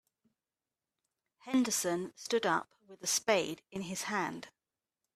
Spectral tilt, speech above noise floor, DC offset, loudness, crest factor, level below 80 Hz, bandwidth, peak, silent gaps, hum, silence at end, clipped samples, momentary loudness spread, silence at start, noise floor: -2.5 dB/octave; over 56 dB; under 0.1%; -33 LUFS; 24 dB; -78 dBFS; 15.5 kHz; -14 dBFS; none; none; 0.7 s; under 0.1%; 12 LU; 1.45 s; under -90 dBFS